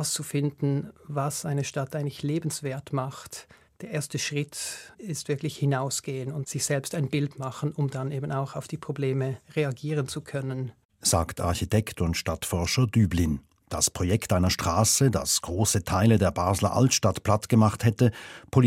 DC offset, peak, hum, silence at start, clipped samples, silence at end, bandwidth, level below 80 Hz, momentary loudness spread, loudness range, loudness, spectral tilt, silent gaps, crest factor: under 0.1%; -6 dBFS; none; 0 s; under 0.1%; 0 s; 16.5 kHz; -50 dBFS; 12 LU; 8 LU; -27 LUFS; -5 dB/octave; 10.85-10.89 s; 20 dB